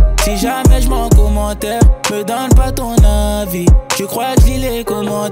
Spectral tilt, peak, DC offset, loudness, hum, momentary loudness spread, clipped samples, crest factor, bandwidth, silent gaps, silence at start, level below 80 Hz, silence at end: -5.5 dB/octave; 0 dBFS; under 0.1%; -13 LUFS; none; 6 LU; under 0.1%; 10 dB; 16.5 kHz; none; 0 s; -14 dBFS; 0 s